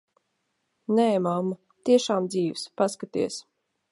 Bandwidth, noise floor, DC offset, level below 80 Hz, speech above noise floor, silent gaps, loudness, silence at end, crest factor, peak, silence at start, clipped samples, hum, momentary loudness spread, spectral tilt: 11.5 kHz; -76 dBFS; under 0.1%; -74 dBFS; 52 dB; none; -26 LUFS; 0.5 s; 18 dB; -8 dBFS; 0.9 s; under 0.1%; none; 10 LU; -5.5 dB/octave